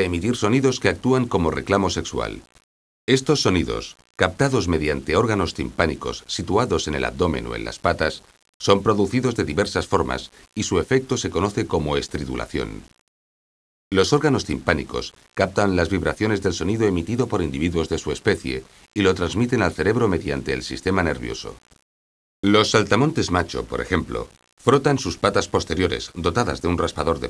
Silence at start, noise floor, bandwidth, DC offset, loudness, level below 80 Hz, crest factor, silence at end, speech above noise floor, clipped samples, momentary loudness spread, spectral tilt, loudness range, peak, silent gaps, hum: 0 s; under -90 dBFS; 11 kHz; under 0.1%; -22 LUFS; -40 dBFS; 22 dB; 0 s; over 69 dB; under 0.1%; 10 LU; -5 dB/octave; 3 LU; 0 dBFS; 2.64-3.08 s, 8.49-8.60 s, 13.01-13.91 s, 21.82-22.43 s, 24.52-24.57 s; none